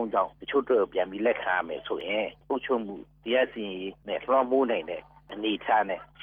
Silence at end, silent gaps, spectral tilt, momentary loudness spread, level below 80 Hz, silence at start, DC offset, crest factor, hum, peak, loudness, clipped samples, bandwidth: 0 s; none; -7.5 dB/octave; 11 LU; -62 dBFS; 0 s; under 0.1%; 16 dB; none; -12 dBFS; -28 LUFS; under 0.1%; 4.6 kHz